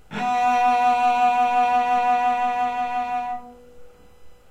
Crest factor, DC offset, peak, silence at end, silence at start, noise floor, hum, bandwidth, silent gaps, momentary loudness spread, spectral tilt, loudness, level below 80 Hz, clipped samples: 12 dB; under 0.1%; -10 dBFS; 0.15 s; 0.1 s; -47 dBFS; none; 9.6 kHz; none; 8 LU; -3.5 dB/octave; -21 LUFS; -58 dBFS; under 0.1%